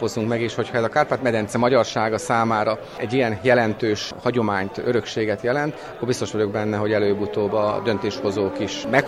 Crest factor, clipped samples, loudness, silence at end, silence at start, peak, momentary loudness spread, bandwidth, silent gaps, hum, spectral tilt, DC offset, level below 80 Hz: 18 dB; under 0.1%; -22 LUFS; 0 s; 0 s; -4 dBFS; 6 LU; 14 kHz; none; none; -5.5 dB/octave; under 0.1%; -54 dBFS